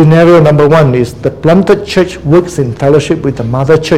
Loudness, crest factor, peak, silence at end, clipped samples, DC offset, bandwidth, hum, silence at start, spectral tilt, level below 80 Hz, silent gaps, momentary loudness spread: -8 LUFS; 8 dB; 0 dBFS; 0 s; 2%; 0.8%; 12.5 kHz; none; 0 s; -7.5 dB/octave; -34 dBFS; none; 9 LU